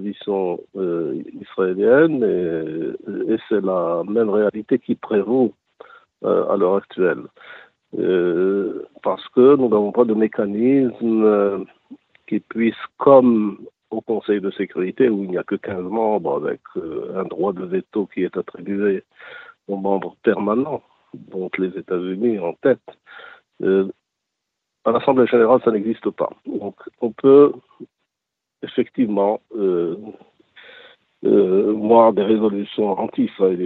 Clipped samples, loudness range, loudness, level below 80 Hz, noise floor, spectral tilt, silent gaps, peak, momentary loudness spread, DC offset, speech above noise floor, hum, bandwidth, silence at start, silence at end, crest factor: under 0.1%; 6 LU; -19 LUFS; -66 dBFS; -82 dBFS; -10 dB/octave; none; 0 dBFS; 14 LU; under 0.1%; 64 dB; none; 4.2 kHz; 0 s; 0 s; 18 dB